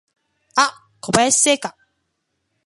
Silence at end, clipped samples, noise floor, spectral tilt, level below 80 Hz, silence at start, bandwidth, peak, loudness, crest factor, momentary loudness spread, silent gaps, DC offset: 0.95 s; under 0.1%; -73 dBFS; -1.5 dB/octave; -54 dBFS; 0.55 s; 11.5 kHz; 0 dBFS; -17 LUFS; 22 dB; 15 LU; none; under 0.1%